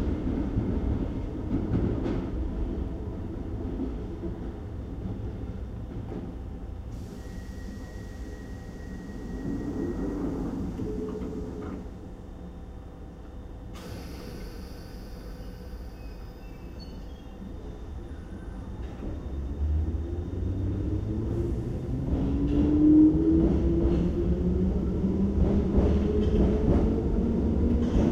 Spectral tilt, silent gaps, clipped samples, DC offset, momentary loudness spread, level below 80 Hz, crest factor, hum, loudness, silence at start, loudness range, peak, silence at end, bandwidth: -9.5 dB/octave; none; under 0.1%; under 0.1%; 18 LU; -34 dBFS; 18 dB; none; -29 LUFS; 0 s; 18 LU; -10 dBFS; 0 s; 8 kHz